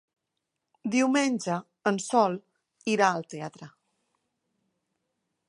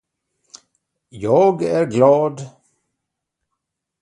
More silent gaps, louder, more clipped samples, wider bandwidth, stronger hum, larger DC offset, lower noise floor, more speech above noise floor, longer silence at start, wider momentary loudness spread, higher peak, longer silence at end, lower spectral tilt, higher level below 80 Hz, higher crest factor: neither; second, -27 LUFS vs -16 LUFS; neither; about the same, 11 kHz vs 10.5 kHz; neither; neither; first, -83 dBFS vs -79 dBFS; second, 57 dB vs 64 dB; second, 0.85 s vs 1.15 s; about the same, 15 LU vs 17 LU; second, -6 dBFS vs 0 dBFS; first, 1.8 s vs 1.55 s; second, -4.5 dB/octave vs -7.5 dB/octave; second, -80 dBFS vs -60 dBFS; about the same, 24 dB vs 20 dB